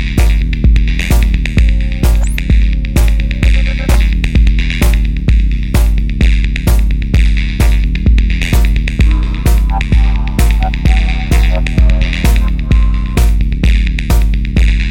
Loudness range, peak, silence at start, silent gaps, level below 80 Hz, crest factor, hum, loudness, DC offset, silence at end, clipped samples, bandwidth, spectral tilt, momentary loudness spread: 0 LU; 0 dBFS; 0 s; none; -10 dBFS; 10 dB; none; -13 LUFS; under 0.1%; 0 s; under 0.1%; 16.5 kHz; -6 dB/octave; 2 LU